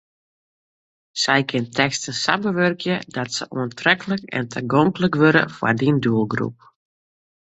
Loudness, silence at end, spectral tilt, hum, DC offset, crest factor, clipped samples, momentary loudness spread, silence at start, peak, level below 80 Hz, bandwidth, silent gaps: -20 LUFS; 0.9 s; -5 dB/octave; none; under 0.1%; 20 dB; under 0.1%; 9 LU; 1.15 s; 0 dBFS; -58 dBFS; 8.2 kHz; none